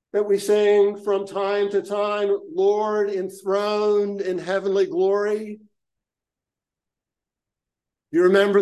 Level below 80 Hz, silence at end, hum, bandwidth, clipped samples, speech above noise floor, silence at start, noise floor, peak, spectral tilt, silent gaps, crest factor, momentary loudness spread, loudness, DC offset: -78 dBFS; 0 s; none; 12.5 kHz; under 0.1%; 68 dB; 0.15 s; -88 dBFS; -4 dBFS; -5.5 dB/octave; none; 18 dB; 8 LU; -21 LUFS; under 0.1%